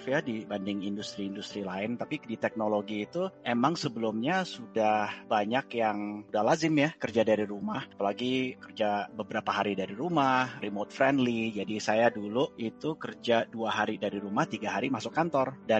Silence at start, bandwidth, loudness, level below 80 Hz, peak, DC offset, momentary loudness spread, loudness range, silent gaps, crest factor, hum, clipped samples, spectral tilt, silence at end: 0 s; 8.4 kHz; -30 LUFS; -72 dBFS; -10 dBFS; under 0.1%; 9 LU; 3 LU; none; 20 dB; none; under 0.1%; -5.5 dB/octave; 0 s